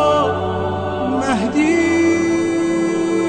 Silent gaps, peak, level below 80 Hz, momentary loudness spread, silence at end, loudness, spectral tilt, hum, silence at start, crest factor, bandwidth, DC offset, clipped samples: none; -6 dBFS; -46 dBFS; 6 LU; 0 s; -17 LUFS; -5.5 dB/octave; none; 0 s; 10 dB; 9.6 kHz; 0.2%; under 0.1%